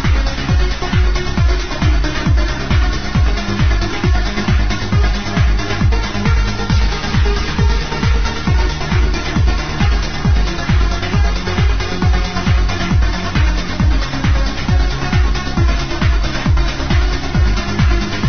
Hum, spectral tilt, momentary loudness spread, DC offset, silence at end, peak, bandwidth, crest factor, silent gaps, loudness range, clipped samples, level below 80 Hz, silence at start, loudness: none; -5.5 dB/octave; 1 LU; 5%; 0 s; -2 dBFS; 6.6 kHz; 12 dB; none; 0 LU; under 0.1%; -16 dBFS; 0 s; -16 LUFS